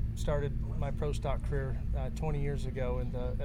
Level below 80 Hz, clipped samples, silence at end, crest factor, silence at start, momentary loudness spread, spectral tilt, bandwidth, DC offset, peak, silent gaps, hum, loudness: -34 dBFS; under 0.1%; 0 s; 12 dB; 0 s; 2 LU; -7.5 dB/octave; 11 kHz; under 0.1%; -20 dBFS; none; none; -35 LUFS